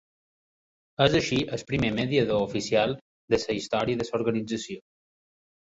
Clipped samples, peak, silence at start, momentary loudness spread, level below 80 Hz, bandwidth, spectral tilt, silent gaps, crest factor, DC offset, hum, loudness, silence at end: under 0.1%; -6 dBFS; 1 s; 10 LU; -52 dBFS; 8 kHz; -5 dB/octave; 3.01-3.28 s; 22 dB; under 0.1%; none; -26 LUFS; 0.9 s